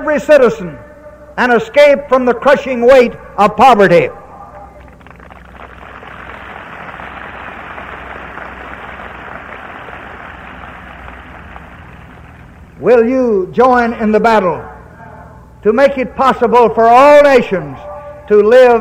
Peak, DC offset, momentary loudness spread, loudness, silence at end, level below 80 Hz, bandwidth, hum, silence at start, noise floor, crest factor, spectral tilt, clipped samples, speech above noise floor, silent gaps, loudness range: 0 dBFS; under 0.1%; 24 LU; -9 LUFS; 0 s; -40 dBFS; 14 kHz; none; 0 s; -36 dBFS; 12 dB; -6 dB/octave; under 0.1%; 28 dB; none; 20 LU